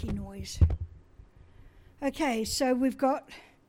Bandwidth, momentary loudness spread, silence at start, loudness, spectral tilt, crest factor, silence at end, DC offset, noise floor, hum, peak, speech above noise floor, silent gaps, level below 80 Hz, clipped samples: 16.5 kHz; 12 LU; 0 s; -30 LUFS; -5.5 dB/octave; 20 dB; 0.25 s; under 0.1%; -54 dBFS; none; -10 dBFS; 26 dB; none; -40 dBFS; under 0.1%